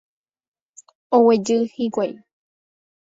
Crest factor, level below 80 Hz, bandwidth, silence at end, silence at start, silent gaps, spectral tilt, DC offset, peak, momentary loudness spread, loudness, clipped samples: 18 dB; -68 dBFS; 7.8 kHz; 0.95 s; 1.1 s; none; -5.5 dB/octave; under 0.1%; -4 dBFS; 10 LU; -19 LUFS; under 0.1%